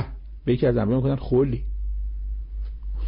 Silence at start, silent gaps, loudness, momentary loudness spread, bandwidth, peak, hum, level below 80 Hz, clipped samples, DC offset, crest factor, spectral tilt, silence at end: 0 s; none; -25 LUFS; 13 LU; 5.4 kHz; -12 dBFS; none; -30 dBFS; under 0.1%; under 0.1%; 14 dB; -13 dB/octave; 0 s